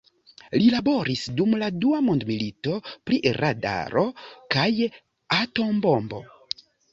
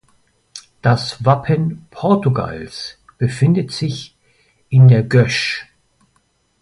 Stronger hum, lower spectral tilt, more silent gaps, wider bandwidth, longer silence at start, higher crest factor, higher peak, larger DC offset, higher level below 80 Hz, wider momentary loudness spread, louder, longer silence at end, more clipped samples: neither; about the same, -6.5 dB/octave vs -7 dB/octave; neither; second, 7.8 kHz vs 11 kHz; about the same, 0.5 s vs 0.55 s; about the same, 20 dB vs 16 dB; second, -4 dBFS vs 0 dBFS; neither; second, -58 dBFS vs -48 dBFS; second, 13 LU vs 19 LU; second, -24 LUFS vs -16 LUFS; second, 0.65 s vs 1 s; neither